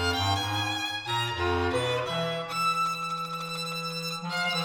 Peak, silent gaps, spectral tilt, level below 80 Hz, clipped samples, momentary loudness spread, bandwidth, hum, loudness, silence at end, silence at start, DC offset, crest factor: -14 dBFS; none; -4 dB/octave; -58 dBFS; under 0.1%; 6 LU; over 20 kHz; none; -28 LUFS; 0 s; 0 s; under 0.1%; 16 dB